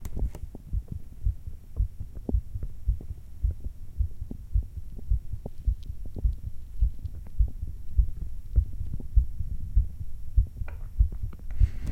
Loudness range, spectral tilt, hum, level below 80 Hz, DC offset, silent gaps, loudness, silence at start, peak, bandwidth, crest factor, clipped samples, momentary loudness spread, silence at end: 4 LU; -9 dB/octave; none; -30 dBFS; under 0.1%; none; -33 LUFS; 0 s; -8 dBFS; 2.6 kHz; 20 dB; under 0.1%; 12 LU; 0 s